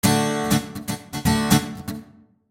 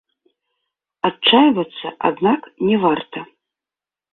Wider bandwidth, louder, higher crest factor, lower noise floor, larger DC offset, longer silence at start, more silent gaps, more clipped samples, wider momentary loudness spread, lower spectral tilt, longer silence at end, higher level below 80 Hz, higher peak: first, 17 kHz vs 4.3 kHz; second, -22 LUFS vs -17 LUFS; about the same, 18 dB vs 18 dB; second, -50 dBFS vs -90 dBFS; neither; second, 0.05 s vs 1.05 s; neither; neither; about the same, 15 LU vs 13 LU; second, -4.5 dB/octave vs -9 dB/octave; second, 0.45 s vs 0.9 s; first, -42 dBFS vs -60 dBFS; about the same, -4 dBFS vs -2 dBFS